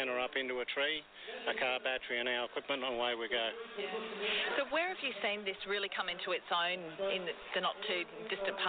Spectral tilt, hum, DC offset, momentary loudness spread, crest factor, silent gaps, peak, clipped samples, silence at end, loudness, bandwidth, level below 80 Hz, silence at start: 0.5 dB/octave; none; under 0.1%; 5 LU; 18 dB; none; -20 dBFS; under 0.1%; 0 s; -36 LUFS; 4.6 kHz; -76 dBFS; 0 s